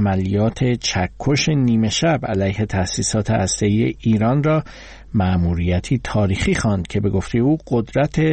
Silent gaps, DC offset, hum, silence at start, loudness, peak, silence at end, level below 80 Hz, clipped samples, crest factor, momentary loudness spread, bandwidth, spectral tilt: none; 0.1%; none; 0 s; -19 LUFS; -6 dBFS; 0 s; -36 dBFS; under 0.1%; 12 dB; 4 LU; 8.8 kHz; -5.5 dB/octave